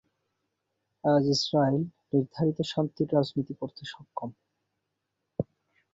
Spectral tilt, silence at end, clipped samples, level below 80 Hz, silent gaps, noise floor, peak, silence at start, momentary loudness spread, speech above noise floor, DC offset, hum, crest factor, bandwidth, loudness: -6.5 dB/octave; 0.5 s; under 0.1%; -64 dBFS; none; -82 dBFS; -12 dBFS; 1.05 s; 15 LU; 55 dB; under 0.1%; none; 18 dB; 7.8 kHz; -29 LUFS